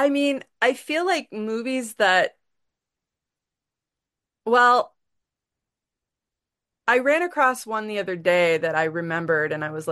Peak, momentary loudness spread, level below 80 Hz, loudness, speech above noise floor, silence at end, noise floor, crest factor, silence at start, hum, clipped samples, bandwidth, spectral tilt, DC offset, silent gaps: -4 dBFS; 10 LU; -74 dBFS; -22 LUFS; 66 dB; 0 s; -88 dBFS; 20 dB; 0 s; none; under 0.1%; 12.5 kHz; -4 dB/octave; under 0.1%; none